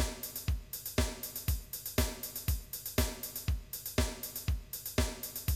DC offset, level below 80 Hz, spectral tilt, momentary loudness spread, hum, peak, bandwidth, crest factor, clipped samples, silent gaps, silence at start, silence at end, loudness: under 0.1%; -40 dBFS; -4 dB/octave; 4 LU; none; -16 dBFS; 19 kHz; 20 dB; under 0.1%; none; 0 s; 0 s; -36 LUFS